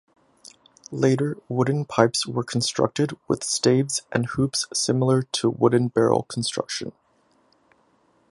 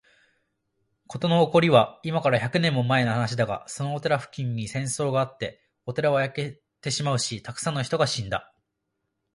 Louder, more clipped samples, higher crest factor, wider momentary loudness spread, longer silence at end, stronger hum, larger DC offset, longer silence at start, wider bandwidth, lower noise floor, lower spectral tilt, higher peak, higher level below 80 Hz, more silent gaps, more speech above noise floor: about the same, -23 LUFS vs -25 LUFS; neither; about the same, 24 dB vs 22 dB; second, 7 LU vs 13 LU; first, 1.4 s vs 0.95 s; neither; neither; second, 0.9 s vs 1.1 s; about the same, 11.5 kHz vs 11.5 kHz; second, -63 dBFS vs -79 dBFS; about the same, -5 dB/octave vs -5 dB/octave; first, 0 dBFS vs -4 dBFS; about the same, -60 dBFS vs -60 dBFS; neither; second, 41 dB vs 55 dB